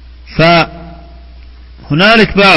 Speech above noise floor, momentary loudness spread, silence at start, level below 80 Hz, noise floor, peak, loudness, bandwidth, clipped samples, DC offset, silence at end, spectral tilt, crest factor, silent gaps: 26 dB; 12 LU; 0.3 s; -32 dBFS; -33 dBFS; 0 dBFS; -8 LUFS; 11 kHz; 0.6%; under 0.1%; 0 s; -6 dB/octave; 10 dB; none